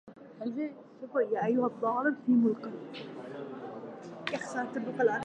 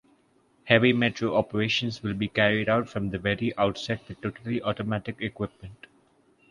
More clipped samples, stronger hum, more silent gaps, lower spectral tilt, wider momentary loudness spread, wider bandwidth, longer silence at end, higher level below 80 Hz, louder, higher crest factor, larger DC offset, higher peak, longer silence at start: neither; neither; neither; about the same, -6 dB/octave vs -6 dB/octave; first, 16 LU vs 13 LU; second, 9.2 kHz vs 11 kHz; second, 0 s vs 0.75 s; second, -84 dBFS vs -54 dBFS; second, -32 LUFS vs -26 LUFS; second, 18 dB vs 24 dB; neither; second, -14 dBFS vs -2 dBFS; second, 0.05 s vs 0.65 s